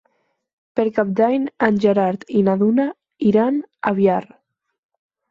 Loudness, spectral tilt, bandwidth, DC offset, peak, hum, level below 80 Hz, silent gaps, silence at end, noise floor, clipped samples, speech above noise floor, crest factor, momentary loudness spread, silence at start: -19 LUFS; -9 dB/octave; 7.2 kHz; under 0.1%; -2 dBFS; none; -62 dBFS; none; 1.1 s; -67 dBFS; under 0.1%; 49 dB; 16 dB; 6 LU; 0.75 s